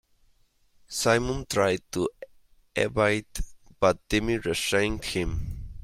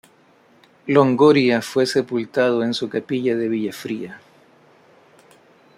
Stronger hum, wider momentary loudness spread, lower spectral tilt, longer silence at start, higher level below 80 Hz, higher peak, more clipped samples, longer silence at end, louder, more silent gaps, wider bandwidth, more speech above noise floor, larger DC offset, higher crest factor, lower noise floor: neither; second, 11 LU vs 15 LU; second, -4 dB/octave vs -6 dB/octave; about the same, 0.9 s vs 0.85 s; first, -42 dBFS vs -66 dBFS; second, -8 dBFS vs -2 dBFS; neither; second, 0 s vs 1.6 s; second, -27 LUFS vs -19 LUFS; neither; about the same, 16.5 kHz vs 15 kHz; about the same, 38 dB vs 36 dB; neither; about the same, 20 dB vs 18 dB; first, -64 dBFS vs -54 dBFS